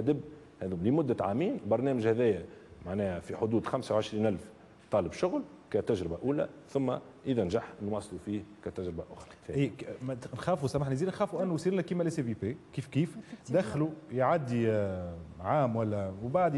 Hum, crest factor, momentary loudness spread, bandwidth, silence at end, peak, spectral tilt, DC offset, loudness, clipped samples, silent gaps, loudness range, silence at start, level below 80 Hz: none; 16 dB; 11 LU; 12 kHz; 0 s; -16 dBFS; -7.5 dB/octave; under 0.1%; -32 LUFS; under 0.1%; none; 4 LU; 0 s; -64 dBFS